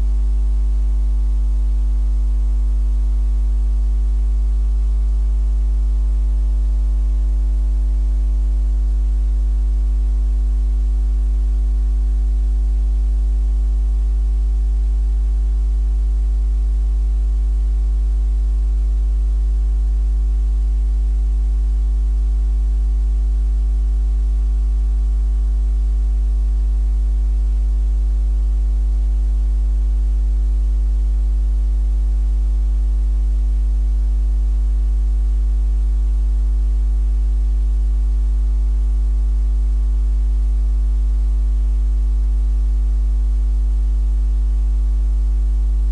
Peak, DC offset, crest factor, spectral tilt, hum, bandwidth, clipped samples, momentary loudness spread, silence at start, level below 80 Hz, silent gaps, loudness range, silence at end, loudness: -12 dBFS; under 0.1%; 4 dB; -8 dB/octave; 50 Hz at -15 dBFS; 1.3 kHz; under 0.1%; 0 LU; 0 s; -16 dBFS; none; 0 LU; 0 s; -20 LUFS